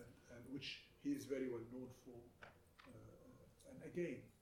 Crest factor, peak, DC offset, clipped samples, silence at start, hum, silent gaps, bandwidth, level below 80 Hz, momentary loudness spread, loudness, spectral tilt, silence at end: 18 dB; -32 dBFS; under 0.1%; under 0.1%; 0 s; none; none; 18 kHz; -76 dBFS; 18 LU; -50 LUFS; -5.5 dB/octave; 0 s